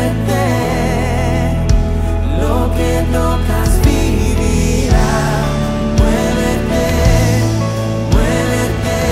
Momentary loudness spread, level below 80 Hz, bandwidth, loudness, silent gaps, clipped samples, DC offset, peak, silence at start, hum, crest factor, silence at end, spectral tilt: 3 LU; -18 dBFS; 16 kHz; -15 LUFS; none; under 0.1%; under 0.1%; 0 dBFS; 0 s; none; 12 dB; 0 s; -6 dB/octave